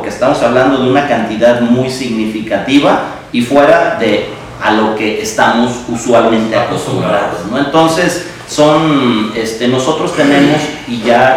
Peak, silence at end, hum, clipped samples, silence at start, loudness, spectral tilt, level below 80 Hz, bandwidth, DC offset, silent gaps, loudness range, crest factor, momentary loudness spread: 0 dBFS; 0 s; none; 0.9%; 0 s; -11 LUFS; -5 dB/octave; -42 dBFS; 15.5 kHz; under 0.1%; none; 1 LU; 10 dB; 7 LU